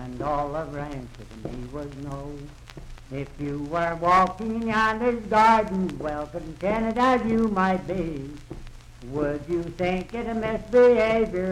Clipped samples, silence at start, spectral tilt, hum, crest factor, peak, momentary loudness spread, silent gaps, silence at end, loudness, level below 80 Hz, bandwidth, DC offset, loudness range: under 0.1%; 0 s; -6.5 dB/octave; none; 16 dB; -8 dBFS; 20 LU; none; 0 s; -24 LUFS; -44 dBFS; 12 kHz; under 0.1%; 10 LU